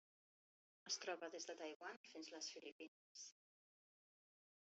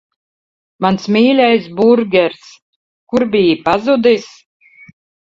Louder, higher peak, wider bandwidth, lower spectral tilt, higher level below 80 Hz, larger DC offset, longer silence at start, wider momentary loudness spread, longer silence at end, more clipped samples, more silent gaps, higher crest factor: second, -52 LUFS vs -13 LUFS; second, -34 dBFS vs 0 dBFS; about the same, 8 kHz vs 7.6 kHz; second, 1 dB/octave vs -6.5 dB/octave; second, under -90 dBFS vs -54 dBFS; neither; about the same, 0.85 s vs 0.8 s; first, 13 LU vs 7 LU; first, 1.35 s vs 1.05 s; neither; about the same, 1.76-1.80 s, 1.97-2.04 s, 2.72-2.79 s, 2.88-3.15 s vs 2.62-3.07 s; first, 22 dB vs 14 dB